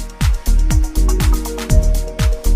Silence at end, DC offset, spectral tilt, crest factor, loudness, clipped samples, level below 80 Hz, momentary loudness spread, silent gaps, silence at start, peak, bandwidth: 0 s; under 0.1%; -5.5 dB/octave; 12 dB; -18 LUFS; under 0.1%; -14 dBFS; 3 LU; none; 0 s; -2 dBFS; 15.5 kHz